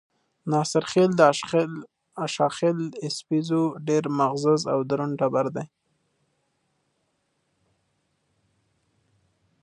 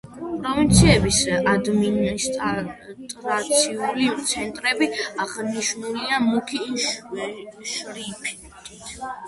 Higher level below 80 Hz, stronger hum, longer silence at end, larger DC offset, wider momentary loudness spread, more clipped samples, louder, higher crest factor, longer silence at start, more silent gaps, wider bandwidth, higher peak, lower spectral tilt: second, -72 dBFS vs -38 dBFS; neither; first, 3.95 s vs 0 s; neither; second, 13 LU vs 16 LU; neither; about the same, -24 LUFS vs -22 LUFS; about the same, 24 dB vs 20 dB; first, 0.45 s vs 0.05 s; neither; about the same, 11.5 kHz vs 11.5 kHz; about the same, -2 dBFS vs -2 dBFS; first, -5.5 dB/octave vs -4 dB/octave